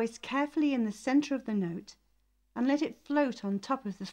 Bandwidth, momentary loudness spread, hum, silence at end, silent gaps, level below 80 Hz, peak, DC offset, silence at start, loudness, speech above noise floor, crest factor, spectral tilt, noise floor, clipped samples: 10 kHz; 7 LU; none; 0 s; none; -70 dBFS; -16 dBFS; under 0.1%; 0 s; -31 LUFS; 40 dB; 14 dB; -6 dB/octave; -71 dBFS; under 0.1%